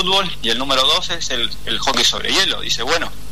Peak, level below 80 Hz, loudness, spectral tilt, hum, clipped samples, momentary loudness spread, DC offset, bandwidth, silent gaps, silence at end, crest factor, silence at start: -4 dBFS; -38 dBFS; -16 LUFS; -1.5 dB/octave; 50 Hz at -40 dBFS; under 0.1%; 6 LU; 6%; 13.5 kHz; none; 0 s; 14 dB; 0 s